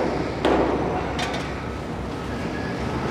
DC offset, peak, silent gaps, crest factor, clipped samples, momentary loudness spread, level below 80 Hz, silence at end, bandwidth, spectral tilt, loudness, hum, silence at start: under 0.1%; -6 dBFS; none; 18 dB; under 0.1%; 9 LU; -38 dBFS; 0 s; 15 kHz; -6 dB/octave; -25 LUFS; none; 0 s